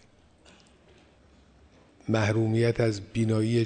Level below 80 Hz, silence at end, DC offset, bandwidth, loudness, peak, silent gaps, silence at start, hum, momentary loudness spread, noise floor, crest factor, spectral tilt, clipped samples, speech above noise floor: -58 dBFS; 0 s; under 0.1%; 9.4 kHz; -26 LUFS; -12 dBFS; none; 2.1 s; none; 5 LU; -58 dBFS; 16 dB; -7 dB/octave; under 0.1%; 33 dB